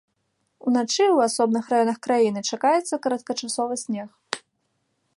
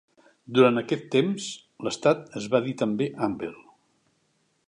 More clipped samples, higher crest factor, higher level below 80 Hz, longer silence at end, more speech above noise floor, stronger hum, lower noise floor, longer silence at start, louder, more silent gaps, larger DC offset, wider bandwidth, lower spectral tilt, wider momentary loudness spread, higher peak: neither; about the same, 22 dB vs 22 dB; second, -76 dBFS vs -70 dBFS; second, 0.8 s vs 1.1 s; first, 51 dB vs 45 dB; neither; about the same, -73 dBFS vs -70 dBFS; first, 0.65 s vs 0.5 s; about the same, -23 LUFS vs -25 LUFS; neither; neither; about the same, 11.5 kHz vs 11 kHz; second, -3.5 dB/octave vs -5.5 dB/octave; about the same, 13 LU vs 13 LU; first, -2 dBFS vs -6 dBFS